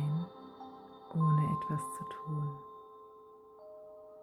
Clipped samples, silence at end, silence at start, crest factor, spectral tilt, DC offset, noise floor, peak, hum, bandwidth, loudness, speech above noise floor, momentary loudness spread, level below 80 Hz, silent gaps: under 0.1%; 0 s; 0 s; 16 dB; -8 dB/octave; under 0.1%; -56 dBFS; -20 dBFS; none; 12.5 kHz; -35 LUFS; 17 dB; 24 LU; -70 dBFS; none